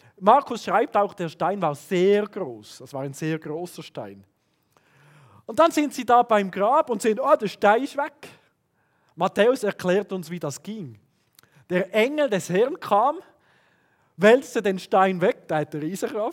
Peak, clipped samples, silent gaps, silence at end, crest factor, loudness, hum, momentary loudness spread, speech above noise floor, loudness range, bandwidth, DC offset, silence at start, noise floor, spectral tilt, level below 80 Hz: -2 dBFS; under 0.1%; none; 0 s; 22 dB; -23 LUFS; none; 15 LU; 46 dB; 6 LU; 17 kHz; under 0.1%; 0.2 s; -68 dBFS; -5.5 dB/octave; -76 dBFS